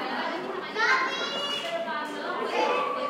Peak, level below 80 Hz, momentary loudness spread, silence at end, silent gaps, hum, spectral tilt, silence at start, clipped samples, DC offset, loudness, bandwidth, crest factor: -10 dBFS; -82 dBFS; 8 LU; 0 s; none; none; -2.5 dB/octave; 0 s; under 0.1%; under 0.1%; -28 LUFS; 16 kHz; 18 dB